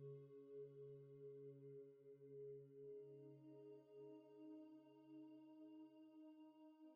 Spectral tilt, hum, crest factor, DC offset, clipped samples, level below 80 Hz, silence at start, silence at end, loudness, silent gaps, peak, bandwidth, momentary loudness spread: -9 dB/octave; none; 12 dB; under 0.1%; under 0.1%; under -90 dBFS; 0 s; 0 s; -62 LUFS; none; -50 dBFS; 4.8 kHz; 6 LU